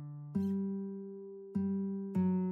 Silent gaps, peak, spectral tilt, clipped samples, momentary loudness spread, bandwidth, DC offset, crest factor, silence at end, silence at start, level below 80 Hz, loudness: none; -22 dBFS; -11.5 dB/octave; under 0.1%; 12 LU; 2.7 kHz; under 0.1%; 14 dB; 0 s; 0 s; -72 dBFS; -37 LUFS